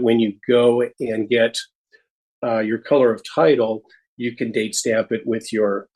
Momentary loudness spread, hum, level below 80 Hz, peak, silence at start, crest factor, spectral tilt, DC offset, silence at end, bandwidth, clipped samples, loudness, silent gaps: 12 LU; none; -68 dBFS; -4 dBFS; 0 s; 16 dB; -4.5 dB/octave; under 0.1%; 0.15 s; 12.5 kHz; under 0.1%; -20 LUFS; 1.75-1.85 s, 2.10-2.42 s, 4.07-4.17 s